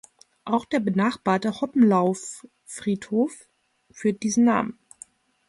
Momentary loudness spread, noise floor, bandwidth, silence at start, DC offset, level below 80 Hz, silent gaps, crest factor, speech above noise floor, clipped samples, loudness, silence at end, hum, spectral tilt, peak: 17 LU; -50 dBFS; 11.5 kHz; 0.45 s; under 0.1%; -66 dBFS; none; 16 dB; 28 dB; under 0.1%; -24 LUFS; 0.75 s; none; -5.5 dB/octave; -8 dBFS